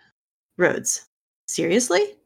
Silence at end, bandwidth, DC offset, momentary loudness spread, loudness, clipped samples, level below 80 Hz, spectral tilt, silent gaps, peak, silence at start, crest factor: 0.15 s; 18 kHz; under 0.1%; 10 LU; -22 LUFS; under 0.1%; -72 dBFS; -3 dB/octave; 1.07-1.48 s; -4 dBFS; 0.6 s; 20 dB